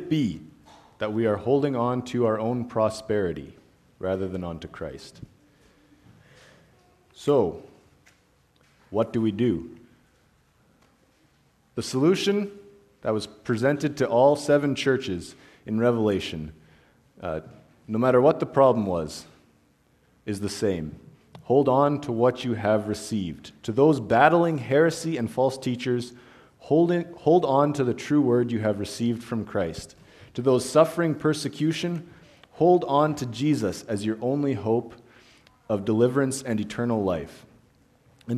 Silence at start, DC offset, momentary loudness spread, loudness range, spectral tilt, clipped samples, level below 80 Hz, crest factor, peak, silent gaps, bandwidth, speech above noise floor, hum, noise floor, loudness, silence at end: 0 s; under 0.1%; 16 LU; 8 LU; -6.5 dB/octave; under 0.1%; -58 dBFS; 22 dB; -2 dBFS; none; 13.5 kHz; 39 dB; none; -63 dBFS; -24 LUFS; 0 s